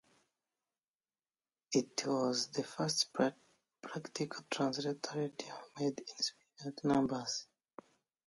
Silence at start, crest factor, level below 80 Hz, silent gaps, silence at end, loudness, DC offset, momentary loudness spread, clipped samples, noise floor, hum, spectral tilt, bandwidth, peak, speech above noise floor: 1.7 s; 20 dB; -76 dBFS; none; 0.85 s; -37 LUFS; under 0.1%; 13 LU; under 0.1%; under -90 dBFS; none; -4 dB/octave; 11.5 kHz; -18 dBFS; over 53 dB